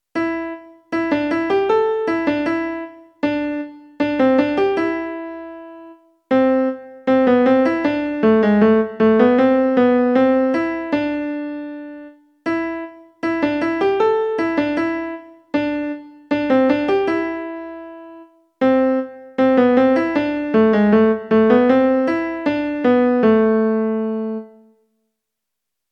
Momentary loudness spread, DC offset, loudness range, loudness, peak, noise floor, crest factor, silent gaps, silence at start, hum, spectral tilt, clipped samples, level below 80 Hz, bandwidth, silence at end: 16 LU; under 0.1%; 6 LU; -18 LUFS; 0 dBFS; -81 dBFS; 18 dB; none; 0.15 s; none; -8 dB/octave; under 0.1%; -54 dBFS; 6.6 kHz; 1.45 s